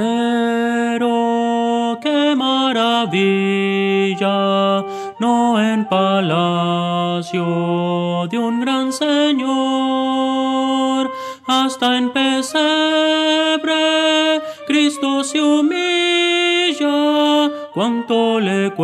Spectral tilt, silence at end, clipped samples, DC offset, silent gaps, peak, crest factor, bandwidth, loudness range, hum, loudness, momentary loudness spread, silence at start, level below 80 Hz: -4.5 dB/octave; 0 s; under 0.1%; under 0.1%; none; -4 dBFS; 14 dB; 13 kHz; 2 LU; none; -16 LUFS; 5 LU; 0 s; -72 dBFS